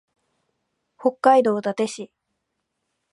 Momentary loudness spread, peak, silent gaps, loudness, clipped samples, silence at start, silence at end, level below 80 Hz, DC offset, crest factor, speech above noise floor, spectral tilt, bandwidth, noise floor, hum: 17 LU; -2 dBFS; none; -20 LUFS; under 0.1%; 1 s; 1.05 s; -80 dBFS; under 0.1%; 22 dB; 58 dB; -5 dB/octave; 11.5 kHz; -78 dBFS; none